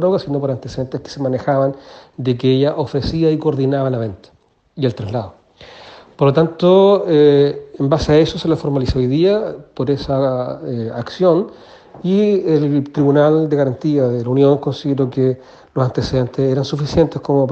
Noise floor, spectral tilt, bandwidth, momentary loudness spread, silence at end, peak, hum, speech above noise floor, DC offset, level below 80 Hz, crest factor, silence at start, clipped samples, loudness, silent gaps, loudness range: -41 dBFS; -8 dB/octave; 8 kHz; 12 LU; 0 s; 0 dBFS; none; 25 dB; under 0.1%; -40 dBFS; 16 dB; 0 s; under 0.1%; -16 LUFS; none; 5 LU